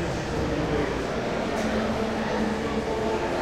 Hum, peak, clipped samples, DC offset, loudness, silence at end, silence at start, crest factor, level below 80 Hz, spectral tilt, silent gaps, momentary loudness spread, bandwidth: none; -12 dBFS; under 0.1%; under 0.1%; -27 LUFS; 0 s; 0 s; 14 dB; -40 dBFS; -5.5 dB/octave; none; 2 LU; 15 kHz